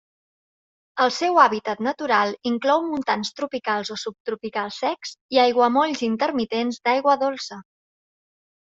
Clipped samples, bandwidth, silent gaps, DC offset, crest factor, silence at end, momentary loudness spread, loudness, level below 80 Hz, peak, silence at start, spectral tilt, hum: under 0.1%; 7.8 kHz; 4.20-4.25 s, 5.21-5.29 s; under 0.1%; 20 dB; 1.1 s; 13 LU; -22 LUFS; -68 dBFS; -4 dBFS; 0.95 s; -3.5 dB/octave; none